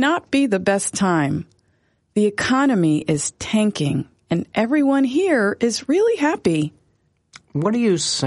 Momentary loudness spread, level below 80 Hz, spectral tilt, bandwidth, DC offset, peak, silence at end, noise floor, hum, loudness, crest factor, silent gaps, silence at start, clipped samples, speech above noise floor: 7 LU; -56 dBFS; -5 dB/octave; 11.5 kHz; under 0.1%; -6 dBFS; 0 s; -64 dBFS; none; -19 LUFS; 14 dB; none; 0 s; under 0.1%; 45 dB